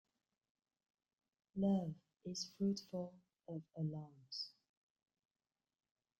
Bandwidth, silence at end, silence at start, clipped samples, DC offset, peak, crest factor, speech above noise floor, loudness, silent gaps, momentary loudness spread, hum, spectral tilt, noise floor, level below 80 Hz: 8.8 kHz; 1.7 s; 1.55 s; under 0.1%; under 0.1%; -26 dBFS; 20 dB; over 48 dB; -44 LUFS; none; 14 LU; none; -6.5 dB/octave; under -90 dBFS; -80 dBFS